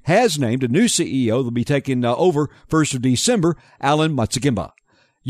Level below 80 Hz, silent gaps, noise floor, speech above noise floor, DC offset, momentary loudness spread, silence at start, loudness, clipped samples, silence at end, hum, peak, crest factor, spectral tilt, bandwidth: -50 dBFS; none; -45 dBFS; 27 dB; under 0.1%; 5 LU; 0.05 s; -19 LUFS; under 0.1%; 0 s; none; -4 dBFS; 14 dB; -5 dB/octave; 13.5 kHz